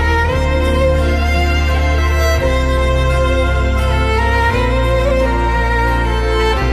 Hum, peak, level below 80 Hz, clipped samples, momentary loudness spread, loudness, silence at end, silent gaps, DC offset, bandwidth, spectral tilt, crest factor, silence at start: none; -2 dBFS; -16 dBFS; under 0.1%; 1 LU; -15 LUFS; 0 s; none; under 0.1%; 14 kHz; -6 dB/octave; 10 dB; 0 s